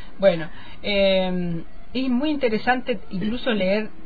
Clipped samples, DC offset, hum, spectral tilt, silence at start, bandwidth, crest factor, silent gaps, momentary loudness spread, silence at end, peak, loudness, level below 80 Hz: under 0.1%; 4%; none; -8.5 dB/octave; 0 s; 5 kHz; 18 dB; none; 11 LU; 0 s; -6 dBFS; -23 LUFS; -44 dBFS